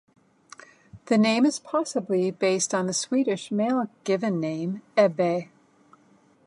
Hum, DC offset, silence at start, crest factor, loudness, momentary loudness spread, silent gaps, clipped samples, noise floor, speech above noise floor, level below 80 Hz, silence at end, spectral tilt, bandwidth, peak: none; under 0.1%; 0.95 s; 18 dB; -25 LUFS; 6 LU; none; under 0.1%; -60 dBFS; 35 dB; -74 dBFS; 1 s; -4.5 dB/octave; 11.5 kHz; -8 dBFS